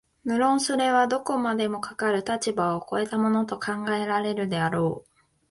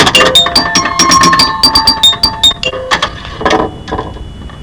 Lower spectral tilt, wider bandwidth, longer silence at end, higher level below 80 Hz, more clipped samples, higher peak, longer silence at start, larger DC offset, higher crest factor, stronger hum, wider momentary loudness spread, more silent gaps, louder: first, -5 dB/octave vs -2 dB/octave; about the same, 11.5 kHz vs 11 kHz; first, 0.5 s vs 0 s; second, -64 dBFS vs -30 dBFS; second, under 0.1% vs 2%; second, -10 dBFS vs 0 dBFS; first, 0.25 s vs 0 s; second, under 0.1% vs 0.8%; first, 16 dB vs 10 dB; neither; second, 7 LU vs 16 LU; neither; second, -25 LUFS vs -7 LUFS